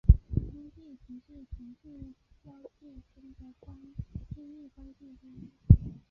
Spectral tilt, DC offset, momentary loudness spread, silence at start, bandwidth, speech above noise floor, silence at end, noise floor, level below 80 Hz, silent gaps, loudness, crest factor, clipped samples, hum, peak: -14 dB/octave; under 0.1%; 29 LU; 0.1 s; 1.1 kHz; 18 dB; 0.2 s; -51 dBFS; -34 dBFS; none; -27 LUFS; 28 dB; under 0.1%; none; -4 dBFS